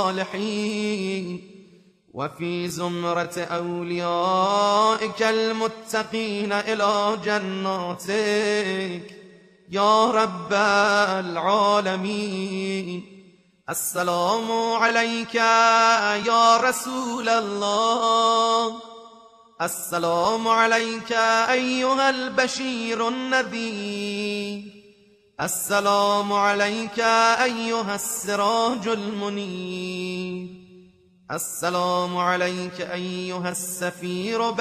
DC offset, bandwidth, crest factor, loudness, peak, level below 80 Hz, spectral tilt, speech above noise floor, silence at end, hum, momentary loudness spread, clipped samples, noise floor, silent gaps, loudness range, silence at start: under 0.1%; 13 kHz; 18 dB; -22 LUFS; -4 dBFS; -68 dBFS; -3.5 dB/octave; 33 dB; 0 s; none; 11 LU; under 0.1%; -56 dBFS; none; 7 LU; 0 s